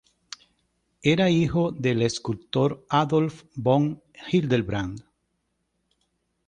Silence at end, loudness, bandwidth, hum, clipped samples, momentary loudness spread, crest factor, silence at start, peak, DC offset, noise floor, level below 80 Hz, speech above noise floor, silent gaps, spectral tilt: 1.45 s; -24 LUFS; 9.8 kHz; none; under 0.1%; 19 LU; 20 dB; 1.05 s; -6 dBFS; under 0.1%; -75 dBFS; -52 dBFS; 52 dB; none; -6.5 dB/octave